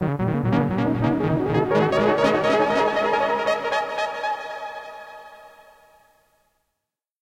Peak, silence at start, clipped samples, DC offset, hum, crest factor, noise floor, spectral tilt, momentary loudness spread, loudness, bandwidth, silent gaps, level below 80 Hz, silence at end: -6 dBFS; 0 s; under 0.1%; under 0.1%; none; 16 dB; -83 dBFS; -7 dB/octave; 15 LU; -22 LUFS; 16.5 kHz; none; -50 dBFS; 1.75 s